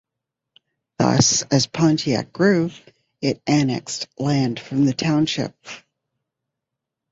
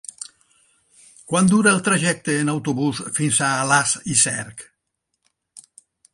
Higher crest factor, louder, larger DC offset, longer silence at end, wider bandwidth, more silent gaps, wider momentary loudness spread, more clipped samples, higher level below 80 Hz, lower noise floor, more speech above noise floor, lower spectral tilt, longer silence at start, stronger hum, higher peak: about the same, 20 dB vs 20 dB; about the same, -20 LUFS vs -19 LUFS; neither; first, 1.35 s vs 0.55 s; second, 8 kHz vs 11.5 kHz; neither; second, 12 LU vs 19 LU; neither; about the same, -56 dBFS vs -60 dBFS; first, -83 dBFS vs -77 dBFS; first, 64 dB vs 57 dB; about the same, -4.5 dB/octave vs -3.5 dB/octave; first, 1 s vs 0.2 s; neither; about the same, -2 dBFS vs -2 dBFS